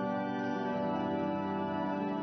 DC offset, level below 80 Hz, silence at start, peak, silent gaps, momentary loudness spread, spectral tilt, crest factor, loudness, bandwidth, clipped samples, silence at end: under 0.1%; -72 dBFS; 0 s; -22 dBFS; none; 1 LU; -5.5 dB/octave; 12 dB; -34 LUFS; 6.2 kHz; under 0.1%; 0 s